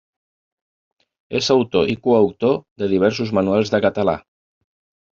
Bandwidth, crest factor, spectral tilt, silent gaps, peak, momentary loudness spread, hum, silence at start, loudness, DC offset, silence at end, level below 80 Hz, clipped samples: 7.6 kHz; 18 dB; -5 dB/octave; 2.71-2.76 s; -2 dBFS; 6 LU; none; 1.3 s; -19 LUFS; under 0.1%; 0.95 s; -56 dBFS; under 0.1%